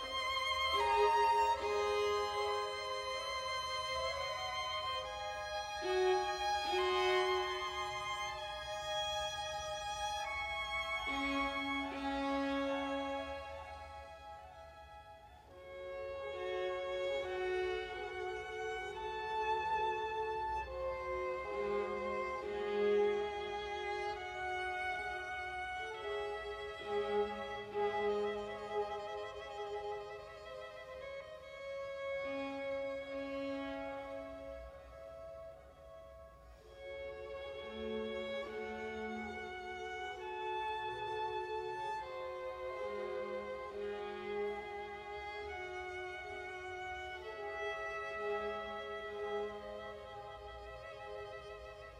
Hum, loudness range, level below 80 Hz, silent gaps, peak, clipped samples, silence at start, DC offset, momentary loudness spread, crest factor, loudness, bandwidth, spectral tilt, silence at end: none; 10 LU; -62 dBFS; none; -22 dBFS; under 0.1%; 0 s; under 0.1%; 15 LU; 18 dB; -39 LUFS; 16 kHz; -3.5 dB/octave; 0 s